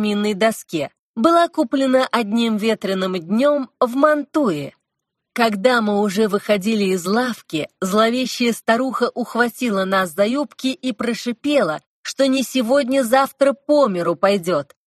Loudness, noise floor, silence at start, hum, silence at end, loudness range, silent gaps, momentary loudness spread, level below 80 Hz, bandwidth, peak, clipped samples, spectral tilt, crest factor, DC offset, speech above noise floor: -19 LUFS; -79 dBFS; 0 s; none; 0.25 s; 2 LU; 0.99-1.14 s, 11.87-12.04 s; 7 LU; -64 dBFS; 13 kHz; -2 dBFS; under 0.1%; -5 dB/octave; 18 dB; under 0.1%; 61 dB